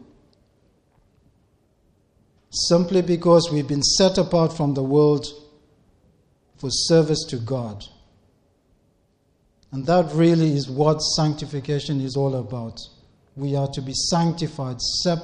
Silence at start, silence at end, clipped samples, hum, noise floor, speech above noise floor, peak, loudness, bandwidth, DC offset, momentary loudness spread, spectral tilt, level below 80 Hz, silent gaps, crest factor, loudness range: 2.5 s; 0 s; under 0.1%; none; -64 dBFS; 44 dB; -4 dBFS; -21 LUFS; 10.5 kHz; under 0.1%; 14 LU; -5 dB/octave; -50 dBFS; none; 18 dB; 6 LU